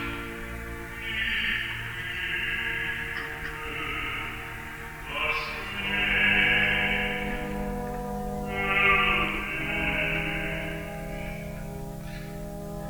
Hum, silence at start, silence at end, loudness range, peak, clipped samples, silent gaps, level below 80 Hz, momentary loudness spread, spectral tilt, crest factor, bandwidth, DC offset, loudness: none; 0 s; 0 s; 6 LU; -10 dBFS; under 0.1%; none; -42 dBFS; 16 LU; -4.5 dB/octave; 20 dB; over 20 kHz; under 0.1%; -27 LUFS